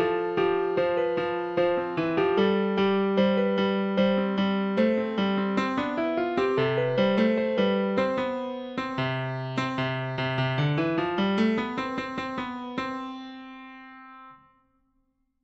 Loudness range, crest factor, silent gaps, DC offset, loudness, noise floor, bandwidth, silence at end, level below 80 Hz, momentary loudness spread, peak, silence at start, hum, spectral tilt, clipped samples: 6 LU; 14 dB; none; under 0.1%; -26 LUFS; -72 dBFS; 8 kHz; 1.1 s; -60 dBFS; 10 LU; -12 dBFS; 0 s; none; -7.5 dB/octave; under 0.1%